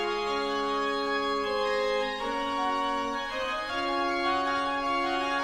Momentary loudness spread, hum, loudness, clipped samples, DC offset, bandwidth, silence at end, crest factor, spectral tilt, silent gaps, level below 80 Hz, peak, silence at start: 3 LU; none; -29 LUFS; under 0.1%; under 0.1%; 14.5 kHz; 0 s; 12 dB; -3 dB/octave; none; -54 dBFS; -16 dBFS; 0 s